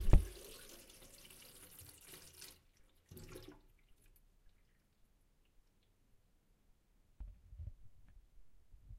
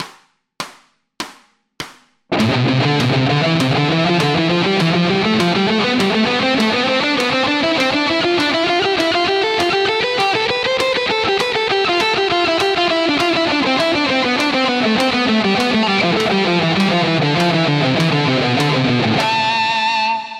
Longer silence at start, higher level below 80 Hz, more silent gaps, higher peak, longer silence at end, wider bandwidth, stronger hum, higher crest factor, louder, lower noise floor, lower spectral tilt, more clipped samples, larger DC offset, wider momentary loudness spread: about the same, 0 s vs 0 s; first, -44 dBFS vs -50 dBFS; neither; second, -12 dBFS vs -2 dBFS; first, 1.1 s vs 0 s; about the same, 16 kHz vs 15 kHz; neither; first, 30 dB vs 14 dB; second, -47 LUFS vs -15 LUFS; first, -73 dBFS vs -50 dBFS; about the same, -6 dB/octave vs -5 dB/octave; neither; neither; first, 13 LU vs 1 LU